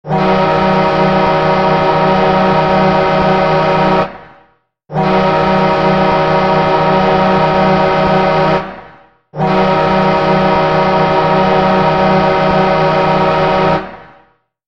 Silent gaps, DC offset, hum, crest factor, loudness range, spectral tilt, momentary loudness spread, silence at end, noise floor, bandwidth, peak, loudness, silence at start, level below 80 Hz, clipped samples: none; 1%; none; 12 dB; 2 LU; -7.5 dB/octave; 3 LU; 0.6 s; -52 dBFS; 7.2 kHz; 0 dBFS; -11 LUFS; 0.05 s; -36 dBFS; under 0.1%